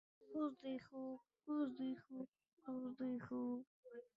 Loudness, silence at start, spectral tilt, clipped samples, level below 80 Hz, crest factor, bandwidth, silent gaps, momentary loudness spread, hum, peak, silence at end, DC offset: -48 LUFS; 0.2 s; -6 dB/octave; under 0.1%; -88 dBFS; 16 dB; 5.2 kHz; 2.28-2.32 s, 2.53-2.57 s, 3.67-3.83 s; 12 LU; none; -32 dBFS; 0.15 s; under 0.1%